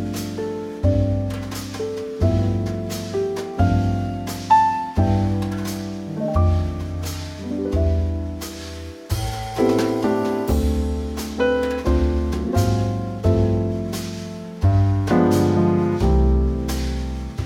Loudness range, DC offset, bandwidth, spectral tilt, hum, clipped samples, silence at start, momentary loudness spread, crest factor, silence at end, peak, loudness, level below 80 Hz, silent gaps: 4 LU; under 0.1%; 16.5 kHz; -7 dB/octave; none; under 0.1%; 0 s; 11 LU; 16 dB; 0 s; -4 dBFS; -22 LUFS; -28 dBFS; none